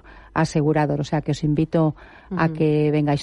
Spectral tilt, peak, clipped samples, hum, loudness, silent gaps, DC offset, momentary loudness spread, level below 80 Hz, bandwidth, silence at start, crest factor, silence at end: -7.5 dB/octave; -8 dBFS; under 0.1%; none; -21 LUFS; none; under 0.1%; 5 LU; -46 dBFS; 10.5 kHz; 0.05 s; 14 dB; 0 s